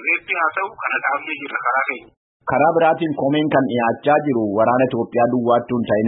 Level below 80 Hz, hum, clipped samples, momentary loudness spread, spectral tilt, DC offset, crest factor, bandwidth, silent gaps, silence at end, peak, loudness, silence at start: -60 dBFS; none; under 0.1%; 7 LU; -11.5 dB/octave; under 0.1%; 14 dB; 4 kHz; 2.17-2.40 s; 0 s; -4 dBFS; -18 LUFS; 0 s